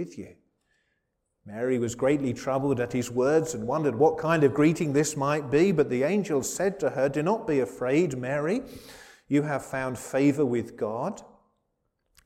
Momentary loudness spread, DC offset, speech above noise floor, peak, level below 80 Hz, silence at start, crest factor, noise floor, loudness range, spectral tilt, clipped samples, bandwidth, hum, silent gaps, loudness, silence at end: 9 LU; under 0.1%; 52 dB; -8 dBFS; -60 dBFS; 0 s; 18 dB; -78 dBFS; 5 LU; -6 dB/octave; under 0.1%; 16 kHz; none; none; -26 LUFS; 1 s